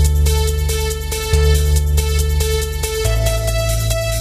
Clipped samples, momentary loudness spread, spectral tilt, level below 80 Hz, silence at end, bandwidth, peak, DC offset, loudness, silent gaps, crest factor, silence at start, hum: under 0.1%; 5 LU; -4.5 dB/octave; -18 dBFS; 0 s; 16 kHz; -2 dBFS; 0.1%; -17 LUFS; none; 14 dB; 0 s; none